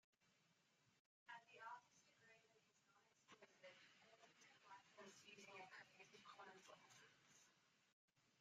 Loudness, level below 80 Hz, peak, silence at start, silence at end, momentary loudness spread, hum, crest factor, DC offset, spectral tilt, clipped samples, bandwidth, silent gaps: -64 LUFS; under -90 dBFS; -46 dBFS; 0.2 s; 0 s; 7 LU; none; 22 dB; under 0.1%; -2 dB/octave; under 0.1%; 8.8 kHz; 0.99-1.26 s, 7.93-8.08 s